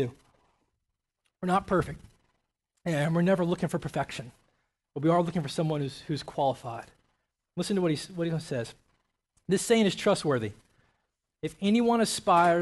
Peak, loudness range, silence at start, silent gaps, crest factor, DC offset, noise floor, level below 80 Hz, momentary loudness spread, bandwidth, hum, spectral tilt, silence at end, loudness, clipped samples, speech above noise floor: -12 dBFS; 5 LU; 0 s; none; 18 dB; under 0.1%; -83 dBFS; -60 dBFS; 15 LU; 12.5 kHz; none; -5.5 dB/octave; 0 s; -28 LUFS; under 0.1%; 56 dB